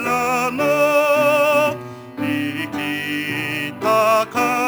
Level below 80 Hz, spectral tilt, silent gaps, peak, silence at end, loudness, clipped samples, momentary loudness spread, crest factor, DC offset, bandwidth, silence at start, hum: -62 dBFS; -4 dB/octave; none; -4 dBFS; 0 s; -18 LUFS; under 0.1%; 9 LU; 14 dB; under 0.1%; over 20 kHz; 0 s; none